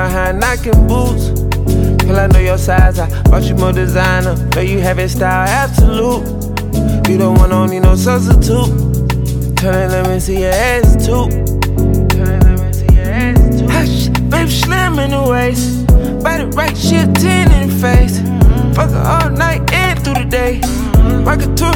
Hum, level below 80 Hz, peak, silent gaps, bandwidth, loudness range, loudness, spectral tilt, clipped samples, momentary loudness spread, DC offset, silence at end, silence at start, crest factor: none; -14 dBFS; 0 dBFS; none; 18 kHz; 1 LU; -12 LUFS; -6 dB/octave; under 0.1%; 5 LU; under 0.1%; 0 s; 0 s; 10 dB